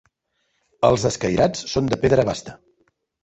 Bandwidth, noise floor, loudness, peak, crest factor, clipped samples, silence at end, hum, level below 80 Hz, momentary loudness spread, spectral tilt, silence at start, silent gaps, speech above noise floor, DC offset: 8.4 kHz; -72 dBFS; -20 LUFS; -4 dBFS; 18 dB; under 0.1%; 0.7 s; none; -46 dBFS; 8 LU; -5.5 dB/octave; 0.8 s; none; 52 dB; under 0.1%